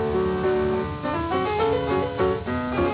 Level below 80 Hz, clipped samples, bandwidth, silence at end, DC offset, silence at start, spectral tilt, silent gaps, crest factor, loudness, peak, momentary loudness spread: -40 dBFS; under 0.1%; 4 kHz; 0 s; under 0.1%; 0 s; -11 dB/octave; none; 14 dB; -24 LUFS; -10 dBFS; 4 LU